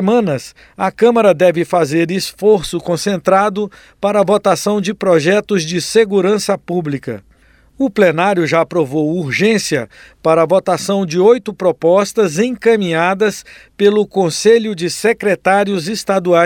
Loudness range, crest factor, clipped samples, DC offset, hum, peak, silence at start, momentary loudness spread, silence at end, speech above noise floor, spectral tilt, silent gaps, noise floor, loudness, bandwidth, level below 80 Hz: 2 LU; 14 dB; under 0.1%; under 0.1%; none; 0 dBFS; 0 s; 8 LU; 0 s; 35 dB; -5 dB/octave; none; -49 dBFS; -14 LUFS; 17 kHz; -50 dBFS